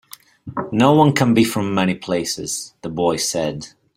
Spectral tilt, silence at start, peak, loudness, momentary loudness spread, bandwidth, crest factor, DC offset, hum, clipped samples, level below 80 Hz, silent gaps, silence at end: -5 dB/octave; 0.45 s; -2 dBFS; -18 LUFS; 15 LU; 16 kHz; 18 dB; under 0.1%; none; under 0.1%; -54 dBFS; none; 0.3 s